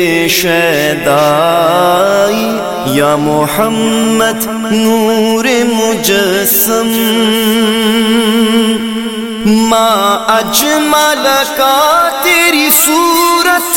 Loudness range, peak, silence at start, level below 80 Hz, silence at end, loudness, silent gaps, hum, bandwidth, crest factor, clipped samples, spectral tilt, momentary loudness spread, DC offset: 3 LU; 0 dBFS; 0 s; -44 dBFS; 0 s; -9 LUFS; none; none; 17 kHz; 10 dB; under 0.1%; -3 dB/octave; 4 LU; 0.3%